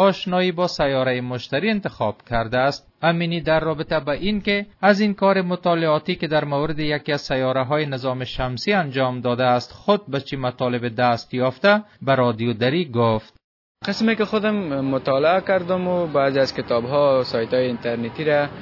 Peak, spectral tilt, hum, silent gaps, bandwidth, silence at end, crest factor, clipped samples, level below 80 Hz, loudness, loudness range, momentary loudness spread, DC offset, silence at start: -2 dBFS; -6.5 dB/octave; none; 13.44-13.75 s; 6 kHz; 0 s; 18 dB; under 0.1%; -46 dBFS; -21 LUFS; 2 LU; 6 LU; under 0.1%; 0 s